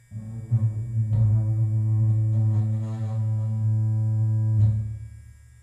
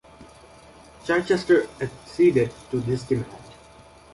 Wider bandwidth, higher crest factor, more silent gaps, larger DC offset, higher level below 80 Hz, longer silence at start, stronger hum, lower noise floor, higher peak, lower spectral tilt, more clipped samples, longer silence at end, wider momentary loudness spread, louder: second, 2.3 kHz vs 11.5 kHz; second, 12 dB vs 18 dB; neither; neither; first, -46 dBFS vs -54 dBFS; about the same, 0.1 s vs 0.2 s; neither; about the same, -46 dBFS vs -49 dBFS; second, -12 dBFS vs -6 dBFS; first, -10.5 dB/octave vs -6.5 dB/octave; neither; second, 0.35 s vs 0.7 s; second, 8 LU vs 15 LU; about the same, -24 LUFS vs -23 LUFS